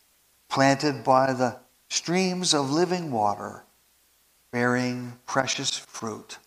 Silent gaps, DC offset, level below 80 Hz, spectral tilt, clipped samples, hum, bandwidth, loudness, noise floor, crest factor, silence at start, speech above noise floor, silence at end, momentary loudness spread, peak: none; under 0.1%; -70 dBFS; -4 dB/octave; under 0.1%; none; 15.5 kHz; -25 LUFS; -63 dBFS; 22 dB; 0.5 s; 38 dB; 0.1 s; 13 LU; -4 dBFS